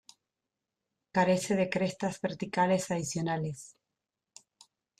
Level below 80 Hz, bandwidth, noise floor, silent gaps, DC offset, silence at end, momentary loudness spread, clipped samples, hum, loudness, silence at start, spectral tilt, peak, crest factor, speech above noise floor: -68 dBFS; 13.5 kHz; -88 dBFS; none; under 0.1%; 1.35 s; 9 LU; under 0.1%; none; -31 LUFS; 1.15 s; -5.5 dB/octave; -14 dBFS; 18 dB; 58 dB